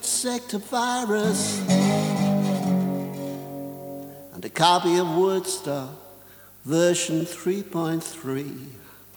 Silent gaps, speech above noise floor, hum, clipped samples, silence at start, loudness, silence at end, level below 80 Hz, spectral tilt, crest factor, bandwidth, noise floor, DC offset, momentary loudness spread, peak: none; 25 dB; 50 Hz at -50 dBFS; under 0.1%; 0 s; -24 LUFS; 0.2 s; -68 dBFS; -4.5 dB/octave; 22 dB; over 20 kHz; -48 dBFS; under 0.1%; 17 LU; -2 dBFS